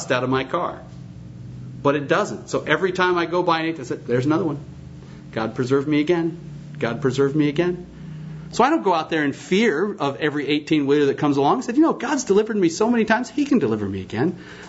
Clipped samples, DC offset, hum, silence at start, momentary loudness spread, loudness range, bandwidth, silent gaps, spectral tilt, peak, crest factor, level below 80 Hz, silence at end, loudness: under 0.1%; under 0.1%; none; 0 s; 18 LU; 4 LU; 8 kHz; none; -5.5 dB/octave; -2 dBFS; 20 dB; -54 dBFS; 0 s; -21 LUFS